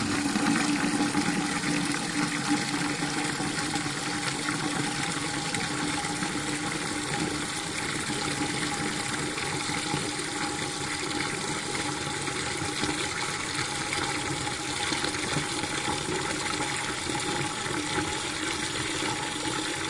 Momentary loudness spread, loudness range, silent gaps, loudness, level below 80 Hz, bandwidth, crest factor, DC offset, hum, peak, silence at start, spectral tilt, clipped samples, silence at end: 3 LU; 2 LU; none; -28 LUFS; -56 dBFS; 11.5 kHz; 18 dB; under 0.1%; none; -12 dBFS; 0 s; -3 dB/octave; under 0.1%; 0 s